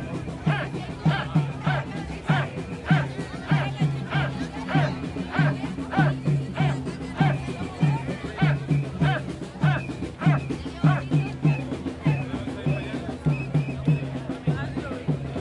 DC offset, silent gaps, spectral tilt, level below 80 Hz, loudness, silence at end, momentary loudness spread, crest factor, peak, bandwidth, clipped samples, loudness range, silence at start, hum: under 0.1%; none; -7.5 dB/octave; -46 dBFS; -26 LUFS; 0 s; 8 LU; 18 dB; -8 dBFS; 10.5 kHz; under 0.1%; 2 LU; 0 s; none